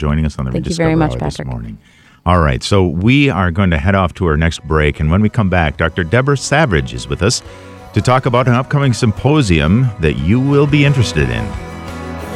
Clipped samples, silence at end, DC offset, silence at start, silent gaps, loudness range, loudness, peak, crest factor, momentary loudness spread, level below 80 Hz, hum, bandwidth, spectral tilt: under 0.1%; 0 s; under 0.1%; 0 s; none; 2 LU; -14 LUFS; 0 dBFS; 14 dB; 11 LU; -26 dBFS; none; 12 kHz; -6 dB/octave